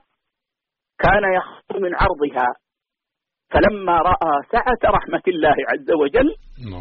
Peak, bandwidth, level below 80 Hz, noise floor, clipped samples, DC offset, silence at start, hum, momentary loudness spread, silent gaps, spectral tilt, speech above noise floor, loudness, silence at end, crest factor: -4 dBFS; 5.6 kHz; -34 dBFS; -85 dBFS; under 0.1%; under 0.1%; 1 s; none; 7 LU; none; -4 dB/octave; 67 dB; -18 LUFS; 0 s; 14 dB